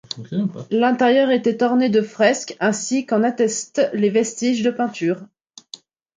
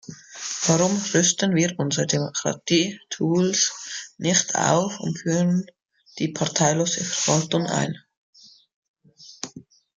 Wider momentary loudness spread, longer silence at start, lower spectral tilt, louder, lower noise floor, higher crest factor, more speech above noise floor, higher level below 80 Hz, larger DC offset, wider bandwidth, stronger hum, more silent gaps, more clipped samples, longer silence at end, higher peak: second, 10 LU vs 14 LU; about the same, 0.15 s vs 0.1 s; about the same, -4.5 dB/octave vs -3.5 dB/octave; first, -19 LUFS vs -22 LUFS; about the same, -43 dBFS vs -45 dBFS; about the same, 18 dB vs 20 dB; about the same, 25 dB vs 23 dB; about the same, -68 dBFS vs -64 dBFS; neither; about the same, 9.6 kHz vs 10 kHz; neither; second, none vs 8.17-8.33 s, 8.74-8.82 s, 8.88-8.94 s; neither; first, 0.95 s vs 0.35 s; about the same, -2 dBFS vs -4 dBFS